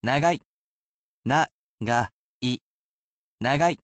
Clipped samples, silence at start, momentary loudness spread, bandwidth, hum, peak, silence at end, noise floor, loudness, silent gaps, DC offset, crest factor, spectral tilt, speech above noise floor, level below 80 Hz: under 0.1%; 0.05 s; 12 LU; 8.8 kHz; none; -10 dBFS; 0.05 s; under -90 dBFS; -26 LUFS; 0.45-1.23 s, 1.51-1.78 s, 2.13-2.41 s, 2.61-3.38 s; under 0.1%; 18 dB; -5 dB/octave; over 67 dB; -58 dBFS